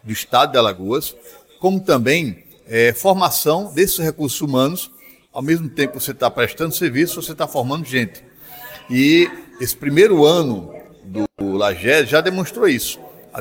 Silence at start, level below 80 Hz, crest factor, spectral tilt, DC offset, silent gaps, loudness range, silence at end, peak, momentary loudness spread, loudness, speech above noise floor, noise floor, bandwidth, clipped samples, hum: 0.05 s; -52 dBFS; 16 dB; -4.5 dB/octave; under 0.1%; none; 4 LU; 0 s; -2 dBFS; 14 LU; -17 LUFS; 20 dB; -38 dBFS; 17 kHz; under 0.1%; none